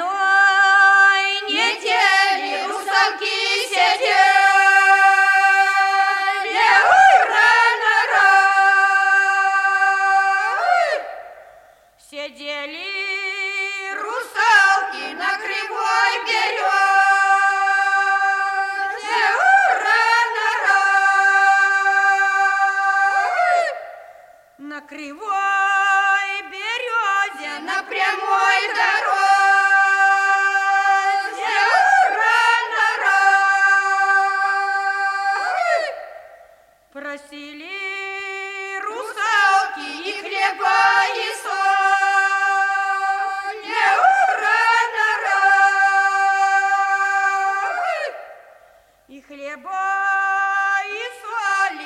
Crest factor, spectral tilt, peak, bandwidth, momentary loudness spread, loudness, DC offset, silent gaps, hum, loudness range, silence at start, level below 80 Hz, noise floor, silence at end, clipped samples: 16 dB; 1 dB/octave; 0 dBFS; 13.5 kHz; 14 LU; -16 LUFS; under 0.1%; none; none; 9 LU; 0 s; -68 dBFS; -52 dBFS; 0 s; under 0.1%